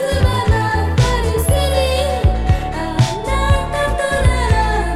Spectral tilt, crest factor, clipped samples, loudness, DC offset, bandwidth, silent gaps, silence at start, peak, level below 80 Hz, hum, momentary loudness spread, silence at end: -5.5 dB/octave; 14 dB; under 0.1%; -16 LUFS; under 0.1%; 15.5 kHz; none; 0 s; -2 dBFS; -20 dBFS; none; 3 LU; 0 s